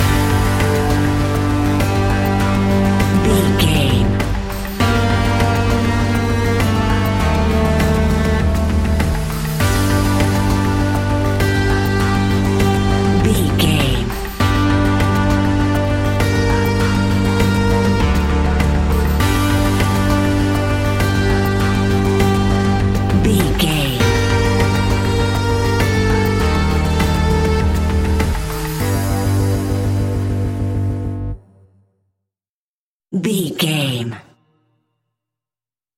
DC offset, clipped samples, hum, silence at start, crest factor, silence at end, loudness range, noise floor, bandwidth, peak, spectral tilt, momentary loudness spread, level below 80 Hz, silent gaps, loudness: under 0.1%; under 0.1%; none; 0 s; 16 dB; 1.75 s; 7 LU; under -90 dBFS; 16.5 kHz; 0 dBFS; -6 dB/octave; 5 LU; -22 dBFS; 32.49-33.00 s; -16 LUFS